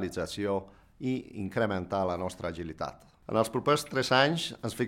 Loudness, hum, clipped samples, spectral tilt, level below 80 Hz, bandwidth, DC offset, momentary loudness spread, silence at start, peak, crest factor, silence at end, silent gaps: -30 LUFS; none; under 0.1%; -5 dB/octave; -58 dBFS; 16.5 kHz; under 0.1%; 13 LU; 0 s; -8 dBFS; 22 dB; 0 s; none